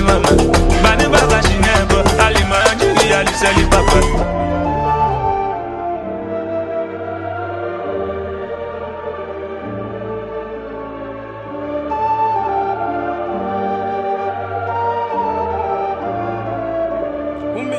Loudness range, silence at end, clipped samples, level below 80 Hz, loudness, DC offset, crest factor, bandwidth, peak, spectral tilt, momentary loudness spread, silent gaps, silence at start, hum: 12 LU; 0 s; under 0.1%; -24 dBFS; -17 LUFS; under 0.1%; 16 dB; 13 kHz; 0 dBFS; -4.5 dB/octave; 14 LU; none; 0 s; none